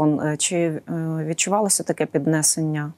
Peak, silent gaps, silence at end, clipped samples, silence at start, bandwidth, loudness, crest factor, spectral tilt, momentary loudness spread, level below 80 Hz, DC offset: -6 dBFS; none; 0.05 s; under 0.1%; 0 s; 16 kHz; -21 LUFS; 16 dB; -4 dB/octave; 7 LU; -66 dBFS; under 0.1%